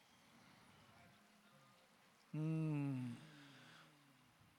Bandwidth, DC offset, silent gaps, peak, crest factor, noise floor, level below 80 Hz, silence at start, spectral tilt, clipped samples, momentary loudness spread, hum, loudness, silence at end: 13.5 kHz; under 0.1%; none; -34 dBFS; 16 dB; -71 dBFS; under -90 dBFS; 0.35 s; -8 dB/octave; under 0.1%; 26 LU; none; -45 LUFS; 0.7 s